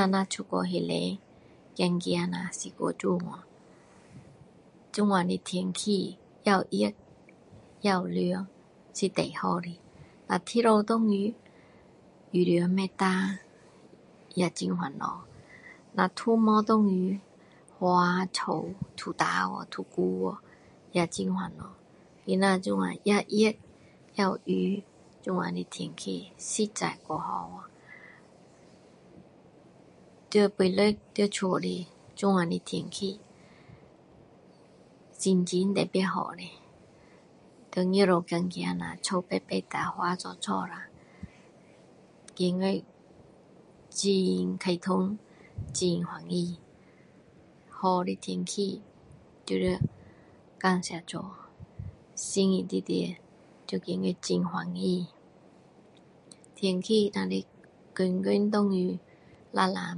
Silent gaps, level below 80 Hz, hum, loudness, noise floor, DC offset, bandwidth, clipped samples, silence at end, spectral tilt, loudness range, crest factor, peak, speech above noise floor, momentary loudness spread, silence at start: none; -64 dBFS; none; -29 LUFS; -57 dBFS; under 0.1%; 11 kHz; under 0.1%; 0 s; -5.5 dB/octave; 6 LU; 22 dB; -8 dBFS; 29 dB; 18 LU; 0 s